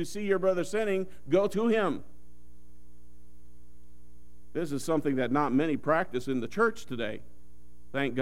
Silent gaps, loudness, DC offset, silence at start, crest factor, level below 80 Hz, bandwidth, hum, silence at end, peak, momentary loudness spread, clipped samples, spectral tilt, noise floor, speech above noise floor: none; -29 LUFS; 1%; 0 s; 18 dB; -58 dBFS; 16 kHz; none; 0 s; -12 dBFS; 9 LU; under 0.1%; -6 dB/octave; -57 dBFS; 28 dB